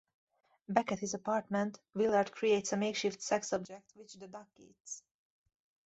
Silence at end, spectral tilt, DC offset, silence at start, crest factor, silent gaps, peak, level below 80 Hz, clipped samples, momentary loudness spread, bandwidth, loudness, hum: 0.85 s; -4 dB/octave; under 0.1%; 0.7 s; 24 dB; 4.80-4.84 s; -12 dBFS; -76 dBFS; under 0.1%; 19 LU; 8.2 kHz; -34 LUFS; none